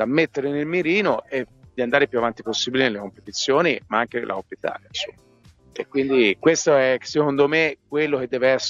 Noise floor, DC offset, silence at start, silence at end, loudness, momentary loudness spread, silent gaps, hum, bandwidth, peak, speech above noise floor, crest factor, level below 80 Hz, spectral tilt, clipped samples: -53 dBFS; under 0.1%; 0 s; 0 s; -21 LUFS; 12 LU; none; none; 7.6 kHz; -4 dBFS; 32 dB; 18 dB; -62 dBFS; -4 dB/octave; under 0.1%